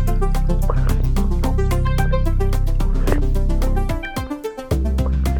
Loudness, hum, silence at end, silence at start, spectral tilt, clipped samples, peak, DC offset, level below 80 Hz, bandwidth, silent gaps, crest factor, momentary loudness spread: -21 LUFS; none; 0 s; 0 s; -7 dB/octave; under 0.1%; -4 dBFS; under 0.1%; -18 dBFS; 17.5 kHz; none; 12 dB; 5 LU